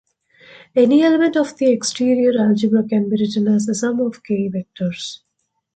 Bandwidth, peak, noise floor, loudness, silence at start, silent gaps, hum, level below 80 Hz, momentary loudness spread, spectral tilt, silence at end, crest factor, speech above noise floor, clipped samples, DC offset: 9.2 kHz; -4 dBFS; -72 dBFS; -17 LUFS; 0.75 s; none; none; -62 dBFS; 11 LU; -5.5 dB/octave; 0.6 s; 14 dB; 56 dB; under 0.1%; under 0.1%